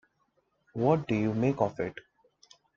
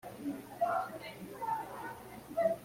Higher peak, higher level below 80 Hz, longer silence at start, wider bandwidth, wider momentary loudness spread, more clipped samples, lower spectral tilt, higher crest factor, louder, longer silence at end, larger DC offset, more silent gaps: first, -10 dBFS vs -20 dBFS; first, -62 dBFS vs -70 dBFS; first, 0.75 s vs 0.05 s; second, 7.4 kHz vs 16.5 kHz; about the same, 13 LU vs 11 LU; neither; first, -8.5 dB/octave vs -5.5 dB/octave; about the same, 20 dB vs 18 dB; first, -29 LUFS vs -38 LUFS; first, 0.8 s vs 0 s; neither; neither